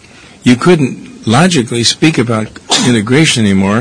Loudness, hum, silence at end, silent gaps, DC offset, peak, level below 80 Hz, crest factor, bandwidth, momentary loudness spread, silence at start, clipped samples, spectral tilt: -10 LUFS; none; 0 s; none; 0.4%; 0 dBFS; -46 dBFS; 10 dB; 11 kHz; 7 LU; 0.45 s; 0.8%; -4.5 dB/octave